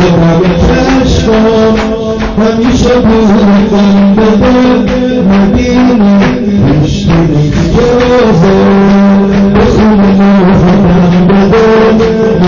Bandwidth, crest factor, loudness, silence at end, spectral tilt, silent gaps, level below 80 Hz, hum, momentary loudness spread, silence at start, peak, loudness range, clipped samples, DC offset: 7.2 kHz; 4 dB; -6 LUFS; 0 s; -7.5 dB/octave; none; -20 dBFS; none; 3 LU; 0 s; 0 dBFS; 2 LU; under 0.1%; under 0.1%